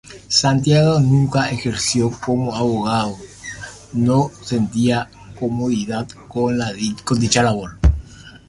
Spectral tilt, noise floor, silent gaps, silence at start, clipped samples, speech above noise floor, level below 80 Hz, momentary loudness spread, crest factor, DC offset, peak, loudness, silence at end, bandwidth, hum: -5 dB/octave; -38 dBFS; none; 0.05 s; under 0.1%; 20 dB; -30 dBFS; 13 LU; 16 dB; under 0.1%; -2 dBFS; -18 LUFS; 0.1 s; 11.5 kHz; none